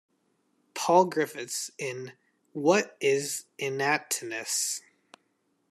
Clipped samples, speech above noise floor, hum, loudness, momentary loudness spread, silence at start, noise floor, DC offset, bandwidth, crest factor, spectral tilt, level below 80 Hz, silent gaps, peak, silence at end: under 0.1%; 46 dB; none; -28 LUFS; 13 LU; 0.75 s; -73 dBFS; under 0.1%; 14 kHz; 22 dB; -3 dB/octave; -82 dBFS; none; -8 dBFS; 0.9 s